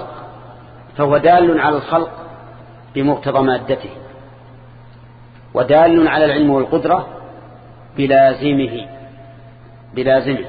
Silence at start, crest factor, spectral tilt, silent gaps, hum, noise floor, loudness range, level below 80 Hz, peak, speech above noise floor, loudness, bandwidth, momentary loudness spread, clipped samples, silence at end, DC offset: 0 s; 16 dB; -10 dB/octave; none; none; -40 dBFS; 6 LU; -46 dBFS; 0 dBFS; 26 dB; -15 LUFS; 4.9 kHz; 23 LU; under 0.1%; 0 s; under 0.1%